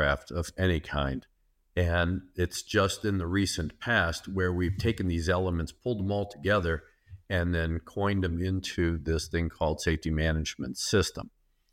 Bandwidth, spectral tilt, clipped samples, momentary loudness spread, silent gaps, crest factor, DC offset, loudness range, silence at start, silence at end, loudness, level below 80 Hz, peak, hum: 16 kHz; -5 dB/octave; under 0.1%; 6 LU; none; 18 dB; under 0.1%; 2 LU; 0 s; 0.45 s; -30 LUFS; -42 dBFS; -12 dBFS; none